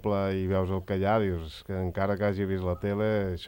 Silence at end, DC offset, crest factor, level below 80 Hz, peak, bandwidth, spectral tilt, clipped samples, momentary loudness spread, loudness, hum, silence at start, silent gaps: 0 s; under 0.1%; 14 dB; -52 dBFS; -14 dBFS; 16.5 kHz; -8.5 dB/octave; under 0.1%; 6 LU; -29 LUFS; none; 0 s; none